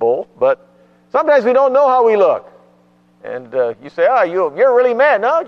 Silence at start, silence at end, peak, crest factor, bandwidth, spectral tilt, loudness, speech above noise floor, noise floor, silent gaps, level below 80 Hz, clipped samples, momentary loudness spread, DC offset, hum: 0 s; 0 s; -2 dBFS; 12 dB; 6.4 kHz; -6 dB/octave; -14 LUFS; 39 dB; -52 dBFS; none; -66 dBFS; under 0.1%; 11 LU; under 0.1%; 60 Hz at -55 dBFS